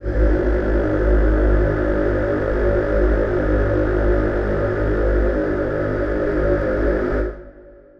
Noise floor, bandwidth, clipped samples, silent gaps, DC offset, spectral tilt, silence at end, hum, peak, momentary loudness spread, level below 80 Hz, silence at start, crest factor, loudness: -44 dBFS; 5.4 kHz; under 0.1%; none; under 0.1%; -9.5 dB/octave; 0.3 s; 50 Hz at -35 dBFS; -6 dBFS; 3 LU; -22 dBFS; 0 s; 14 dB; -20 LUFS